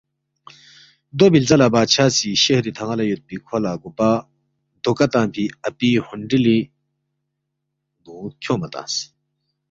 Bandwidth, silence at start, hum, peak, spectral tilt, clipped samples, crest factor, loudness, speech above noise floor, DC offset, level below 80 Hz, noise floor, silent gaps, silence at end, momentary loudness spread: 7.8 kHz; 1.15 s; none; -2 dBFS; -4.5 dB/octave; under 0.1%; 18 dB; -18 LUFS; 59 dB; under 0.1%; -56 dBFS; -77 dBFS; none; 0.65 s; 13 LU